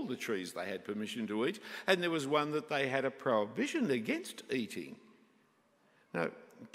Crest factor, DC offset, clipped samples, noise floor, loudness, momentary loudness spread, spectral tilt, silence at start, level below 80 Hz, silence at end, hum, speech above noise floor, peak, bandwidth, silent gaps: 24 dB; under 0.1%; under 0.1%; -71 dBFS; -35 LUFS; 9 LU; -4.5 dB/octave; 0 s; -84 dBFS; 0.05 s; none; 35 dB; -12 dBFS; 16 kHz; none